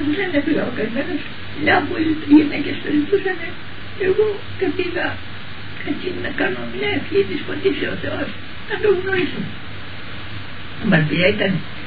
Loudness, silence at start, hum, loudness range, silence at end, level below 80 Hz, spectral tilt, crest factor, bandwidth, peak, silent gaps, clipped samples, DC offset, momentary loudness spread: -20 LUFS; 0 s; none; 4 LU; 0 s; -46 dBFS; -9 dB/octave; 18 dB; 4.9 kHz; -2 dBFS; none; under 0.1%; 4%; 16 LU